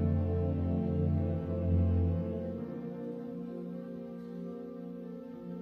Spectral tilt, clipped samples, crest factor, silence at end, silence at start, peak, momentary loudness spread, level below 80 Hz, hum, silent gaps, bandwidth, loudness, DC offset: -11.5 dB/octave; under 0.1%; 16 dB; 0 s; 0 s; -18 dBFS; 13 LU; -48 dBFS; none; none; 3.6 kHz; -35 LUFS; under 0.1%